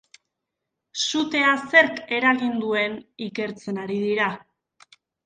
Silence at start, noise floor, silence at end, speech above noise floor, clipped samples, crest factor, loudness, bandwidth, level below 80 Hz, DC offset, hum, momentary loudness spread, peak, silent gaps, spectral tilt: 0.95 s; -82 dBFS; 0.85 s; 60 dB; under 0.1%; 22 dB; -22 LUFS; 9.6 kHz; -68 dBFS; under 0.1%; none; 15 LU; -2 dBFS; none; -3.5 dB/octave